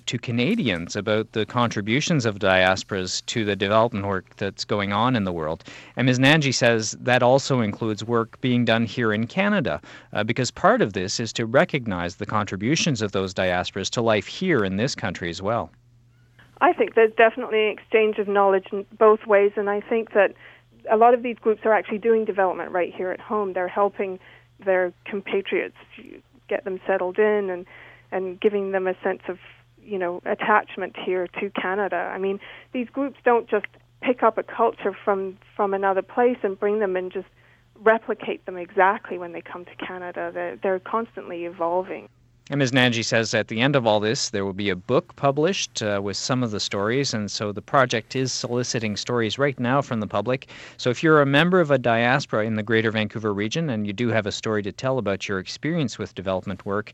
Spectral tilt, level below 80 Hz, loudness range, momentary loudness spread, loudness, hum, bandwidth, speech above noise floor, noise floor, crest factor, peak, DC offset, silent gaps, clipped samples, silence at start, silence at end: -5 dB/octave; -60 dBFS; 5 LU; 11 LU; -23 LUFS; none; 10 kHz; 33 dB; -56 dBFS; 20 dB; -2 dBFS; under 0.1%; none; under 0.1%; 0.05 s; 0 s